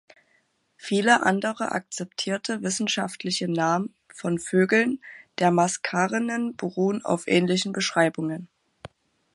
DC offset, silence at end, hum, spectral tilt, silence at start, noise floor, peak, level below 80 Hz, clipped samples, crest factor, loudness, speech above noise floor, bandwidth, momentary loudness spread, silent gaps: under 0.1%; 0.45 s; none; -4.5 dB/octave; 0.8 s; -68 dBFS; -6 dBFS; -70 dBFS; under 0.1%; 20 dB; -24 LUFS; 43 dB; 11.5 kHz; 11 LU; none